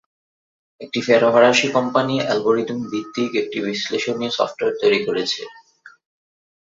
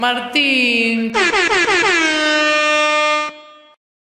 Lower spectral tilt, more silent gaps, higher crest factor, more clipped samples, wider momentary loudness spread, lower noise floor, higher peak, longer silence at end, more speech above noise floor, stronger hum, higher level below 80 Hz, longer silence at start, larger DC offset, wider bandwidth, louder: first, -4 dB/octave vs -1.5 dB/octave; neither; first, 20 dB vs 14 dB; neither; first, 12 LU vs 3 LU; first, under -90 dBFS vs -36 dBFS; about the same, -2 dBFS vs -2 dBFS; first, 0.8 s vs 0.5 s; first, over 71 dB vs 21 dB; neither; second, -64 dBFS vs -52 dBFS; first, 0.8 s vs 0 s; neither; second, 7.8 kHz vs 14.5 kHz; second, -19 LUFS vs -14 LUFS